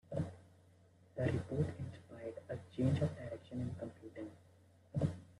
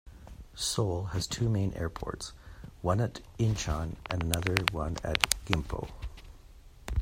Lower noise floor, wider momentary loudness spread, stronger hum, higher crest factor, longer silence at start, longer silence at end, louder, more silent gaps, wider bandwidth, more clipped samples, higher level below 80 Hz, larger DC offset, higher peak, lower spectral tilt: first, -66 dBFS vs -52 dBFS; second, 14 LU vs 18 LU; neither; second, 20 dB vs 32 dB; about the same, 0.1 s vs 0.05 s; about the same, 0.05 s vs 0 s; second, -41 LUFS vs -31 LUFS; neither; second, 11.5 kHz vs 16 kHz; neither; second, -66 dBFS vs -44 dBFS; neither; second, -22 dBFS vs 0 dBFS; first, -8.5 dB/octave vs -4 dB/octave